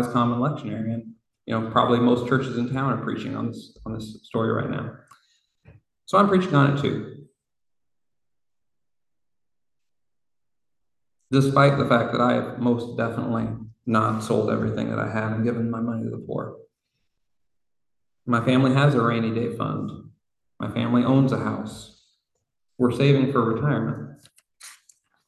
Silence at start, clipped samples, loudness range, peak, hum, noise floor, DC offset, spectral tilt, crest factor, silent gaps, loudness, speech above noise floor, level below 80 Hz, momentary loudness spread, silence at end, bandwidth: 0 s; under 0.1%; 6 LU; -4 dBFS; none; -89 dBFS; under 0.1%; -7.5 dB/octave; 20 dB; none; -23 LUFS; 66 dB; -56 dBFS; 15 LU; 0.55 s; 12 kHz